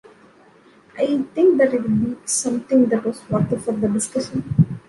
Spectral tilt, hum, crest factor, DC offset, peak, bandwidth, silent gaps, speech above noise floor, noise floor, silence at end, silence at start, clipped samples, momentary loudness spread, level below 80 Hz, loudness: -6 dB/octave; none; 16 dB; under 0.1%; -4 dBFS; 11.5 kHz; none; 32 dB; -51 dBFS; 0.1 s; 0.95 s; under 0.1%; 7 LU; -52 dBFS; -20 LUFS